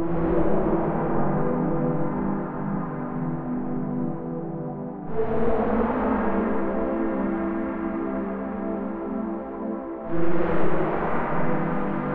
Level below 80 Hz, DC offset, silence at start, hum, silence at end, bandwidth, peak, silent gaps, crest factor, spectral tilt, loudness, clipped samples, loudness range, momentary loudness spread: -42 dBFS; under 0.1%; 0 s; none; 0 s; 4.3 kHz; -8 dBFS; none; 16 dB; -11.5 dB/octave; -27 LUFS; under 0.1%; 3 LU; 8 LU